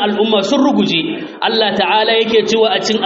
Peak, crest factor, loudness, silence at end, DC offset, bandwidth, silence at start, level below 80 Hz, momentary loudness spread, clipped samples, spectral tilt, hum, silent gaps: -2 dBFS; 12 dB; -13 LUFS; 0 s; under 0.1%; 7.8 kHz; 0 s; -58 dBFS; 5 LU; under 0.1%; -2 dB/octave; none; none